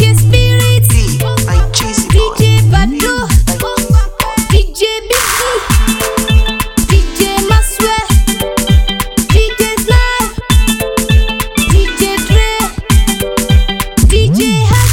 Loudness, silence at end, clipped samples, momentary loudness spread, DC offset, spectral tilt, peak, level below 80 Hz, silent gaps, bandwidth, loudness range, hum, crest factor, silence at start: -11 LUFS; 0 s; 1%; 5 LU; under 0.1%; -4.5 dB/octave; 0 dBFS; -14 dBFS; none; 18 kHz; 1 LU; none; 10 dB; 0 s